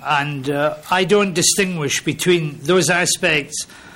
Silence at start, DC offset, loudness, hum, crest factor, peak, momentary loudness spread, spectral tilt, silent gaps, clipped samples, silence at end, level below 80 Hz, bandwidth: 0 s; under 0.1%; -17 LUFS; none; 14 dB; -4 dBFS; 6 LU; -3 dB/octave; none; under 0.1%; 0 s; -52 dBFS; 16.5 kHz